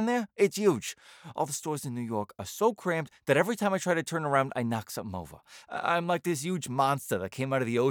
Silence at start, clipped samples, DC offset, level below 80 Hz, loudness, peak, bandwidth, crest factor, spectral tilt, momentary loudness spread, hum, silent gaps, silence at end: 0 s; under 0.1%; under 0.1%; -72 dBFS; -30 LUFS; -10 dBFS; over 20 kHz; 20 dB; -5 dB/octave; 11 LU; none; none; 0 s